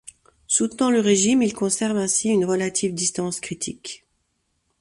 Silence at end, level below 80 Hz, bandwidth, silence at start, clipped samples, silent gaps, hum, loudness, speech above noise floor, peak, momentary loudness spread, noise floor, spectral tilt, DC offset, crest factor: 0.85 s; -60 dBFS; 11.5 kHz; 0.05 s; under 0.1%; none; none; -21 LUFS; 50 dB; -4 dBFS; 12 LU; -72 dBFS; -3.5 dB/octave; under 0.1%; 18 dB